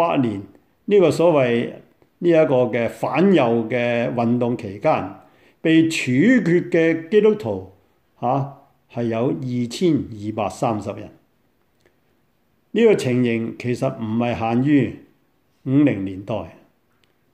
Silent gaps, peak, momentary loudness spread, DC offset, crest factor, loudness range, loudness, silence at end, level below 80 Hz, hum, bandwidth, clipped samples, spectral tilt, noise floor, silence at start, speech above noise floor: none; -4 dBFS; 12 LU; under 0.1%; 16 dB; 6 LU; -19 LUFS; 0.85 s; -60 dBFS; none; 13 kHz; under 0.1%; -7 dB/octave; -65 dBFS; 0 s; 46 dB